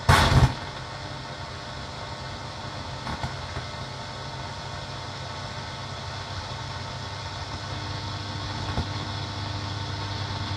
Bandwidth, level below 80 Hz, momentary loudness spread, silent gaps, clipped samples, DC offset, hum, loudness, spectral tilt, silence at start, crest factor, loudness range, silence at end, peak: 14.5 kHz; -40 dBFS; 6 LU; none; under 0.1%; under 0.1%; none; -30 LUFS; -4.5 dB/octave; 0 s; 24 dB; 4 LU; 0 s; -4 dBFS